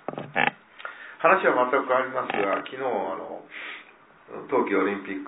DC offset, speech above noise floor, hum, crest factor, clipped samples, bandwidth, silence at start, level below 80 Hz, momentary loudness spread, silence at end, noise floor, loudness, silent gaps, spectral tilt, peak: under 0.1%; 26 dB; none; 22 dB; under 0.1%; 4 kHz; 0.1 s; -76 dBFS; 19 LU; 0 s; -51 dBFS; -25 LUFS; none; -8.5 dB/octave; -4 dBFS